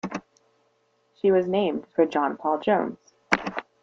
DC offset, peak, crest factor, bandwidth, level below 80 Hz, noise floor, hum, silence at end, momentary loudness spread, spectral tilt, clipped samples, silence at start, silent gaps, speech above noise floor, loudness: under 0.1%; -2 dBFS; 24 dB; 7.6 kHz; -64 dBFS; -68 dBFS; none; 0.2 s; 12 LU; -6 dB/octave; under 0.1%; 0.05 s; none; 44 dB; -25 LUFS